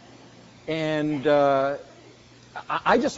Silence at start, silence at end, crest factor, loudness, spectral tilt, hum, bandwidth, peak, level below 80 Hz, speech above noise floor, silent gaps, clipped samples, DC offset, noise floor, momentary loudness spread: 0.65 s; 0 s; 20 dB; -23 LUFS; -4 dB/octave; none; 7.6 kHz; -4 dBFS; -60 dBFS; 27 dB; none; under 0.1%; under 0.1%; -50 dBFS; 21 LU